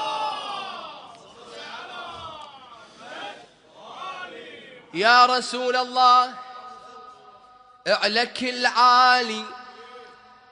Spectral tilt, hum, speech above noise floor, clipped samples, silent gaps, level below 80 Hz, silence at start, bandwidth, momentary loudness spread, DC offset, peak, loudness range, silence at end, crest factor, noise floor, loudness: -1.5 dB/octave; none; 32 dB; under 0.1%; none; -72 dBFS; 0 s; 10.5 kHz; 26 LU; under 0.1%; -2 dBFS; 17 LU; 0.5 s; 22 dB; -51 dBFS; -20 LUFS